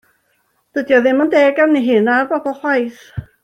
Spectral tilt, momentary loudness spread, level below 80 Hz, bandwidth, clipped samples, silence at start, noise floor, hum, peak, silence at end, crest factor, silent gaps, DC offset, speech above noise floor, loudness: -6.5 dB/octave; 13 LU; -52 dBFS; 9.6 kHz; under 0.1%; 0.75 s; -63 dBFS; none; -2 dBFS; 0.2 s; 14 dB; none; under 0.1%; 49 dB; -15 LUFS